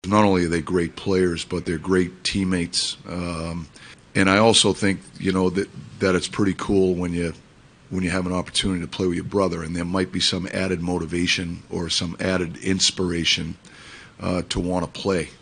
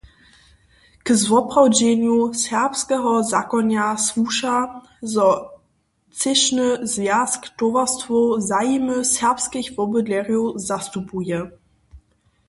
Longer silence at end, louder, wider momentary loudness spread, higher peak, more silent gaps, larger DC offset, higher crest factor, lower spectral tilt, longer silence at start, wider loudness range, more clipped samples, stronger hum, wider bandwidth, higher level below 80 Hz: second, 0.05 s vs 0.5 s; second, -22 LUFS vs -19 LUFS; about the same, 11 LU vs 9 LU; about the same, 0 dBFS vs -2 dBFS; neither; neither; about the same, 22 dB vs 18 dB; about the same, -4 dB/octave vs -3 dB/octave; second, 0.05 s vs 1.05 s; about the same, 3 LU vs 3 LU; neither; neither; about the same, 10.5 kHz vs 11.5 kHz; first, -46 dBFS vs -56 dBFS